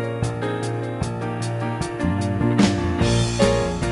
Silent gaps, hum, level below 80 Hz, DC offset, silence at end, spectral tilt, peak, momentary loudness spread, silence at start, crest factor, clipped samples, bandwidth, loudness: none; none; -34 dBFS; under 0.1%; 0 s; -6 dB/octave; -4 dBFS; 8 LU; 0 s; 18 dB; under 0.1%; 11.5 kHz; -22 LUFS